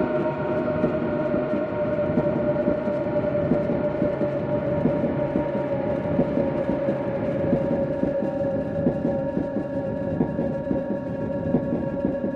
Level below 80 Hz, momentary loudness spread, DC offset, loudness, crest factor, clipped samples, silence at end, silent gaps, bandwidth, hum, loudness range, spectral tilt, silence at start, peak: -46 dBFS; 3 LU; under 0.1%; -25 LUFS; 16 dB; under 0.1%; 0 s; none; 5.8 kHz; none; 2 LU; -10 dB/octave; 0 s; -8 dBFS